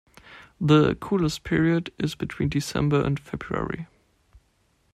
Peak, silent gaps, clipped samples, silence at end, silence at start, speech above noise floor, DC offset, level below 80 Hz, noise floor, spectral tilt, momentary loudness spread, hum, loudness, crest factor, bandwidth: -6 dBFS; none; under 0.1%; 1.1 s; 0.3 s; 43 dB; under 0.1%; -46 dBFS; -66 dBFS; -6.5 dB/octave; 12 LU; none; -24 LUFS; 20 dB; 14 kHz